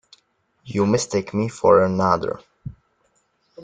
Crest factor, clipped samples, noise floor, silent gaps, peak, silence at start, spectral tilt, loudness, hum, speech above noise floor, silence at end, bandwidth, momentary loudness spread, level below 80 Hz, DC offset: 20 dB; under 0.1%; -66 dBFS; none; -2 dBFS; 0.65 s; -6 dB/octave; -20 LUFS; none; 47 dB; 0 s; 9.6 kHz; 22 LU; -56 dBFS; under 0.1%